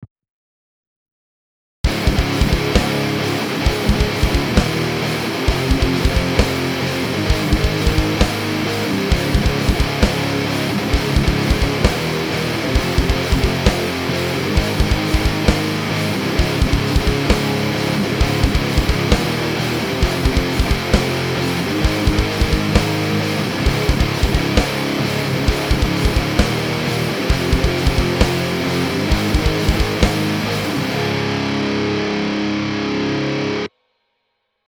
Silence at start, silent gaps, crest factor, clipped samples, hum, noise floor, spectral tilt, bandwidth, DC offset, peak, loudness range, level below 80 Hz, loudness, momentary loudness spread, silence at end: 0 s; 0.11-0.16 s, 0.30-1.06 s, 1.12-1.84 s; 18 dB; under 0.1%; none; -71 dBFS; -5 dB/octave; over 20 kHz; under 0.1%; 0 dBFS; 1 LU; -24 dBFS; -18 LUFS; 3 LU; 1 s